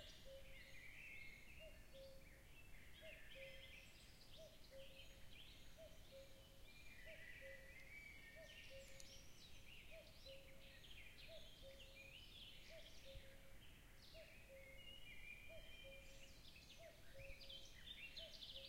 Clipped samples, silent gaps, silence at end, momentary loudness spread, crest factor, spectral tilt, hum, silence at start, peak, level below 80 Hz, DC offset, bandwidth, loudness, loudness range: under 0.1%; none; 0 s; 6 LU; 20 dB; -3 dB/octave; none; 0 s; -38 dBFS; -68 dBFS; under 0.1%; 16 kHz; -61 LUFS; 2 LU